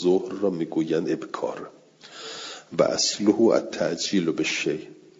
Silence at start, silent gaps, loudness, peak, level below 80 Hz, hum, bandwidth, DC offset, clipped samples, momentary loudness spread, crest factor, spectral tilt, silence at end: 0 s; none; -24 LUFS; -4 dBFS; -70 dBFS; none; 7.8 kHz; under 0.1%; under 0.1%; 16 LU; 22 dB; -4 dB/octave; 0.2 s